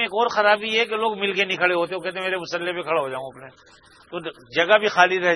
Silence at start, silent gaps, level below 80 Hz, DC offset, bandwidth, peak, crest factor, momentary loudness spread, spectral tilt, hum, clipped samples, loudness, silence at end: 0 s; none; -66 dBFS; under 0.1%; 12 kHz; 0 dBFS; 22 dB; 15 LU; -3.5 dB/octave; none; under 0.1%; -21 LUFS; 0 s